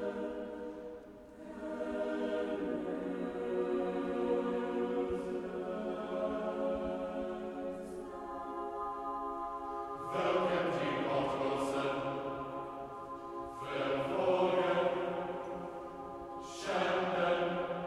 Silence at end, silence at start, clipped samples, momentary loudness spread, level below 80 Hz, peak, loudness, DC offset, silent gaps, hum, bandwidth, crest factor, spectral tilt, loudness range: 0 s; 0 s; under 0.1%; 12 LU; -64 dBFS; -20 dBFS; -36 LUFS; under 0.1%; none; none; 12.5 kHz; 18 dB; -6 dB/octave; 4 LU